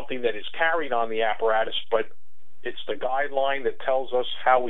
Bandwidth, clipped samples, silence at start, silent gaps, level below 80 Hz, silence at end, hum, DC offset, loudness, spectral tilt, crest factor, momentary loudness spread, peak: 4.1 kHz; under 0.1%; 0 s; none; -68 dBFS; 0 s; none; 4%; -26 LUFS; -6 dB/octave; 18 dB; 9 LU; -6 dBFS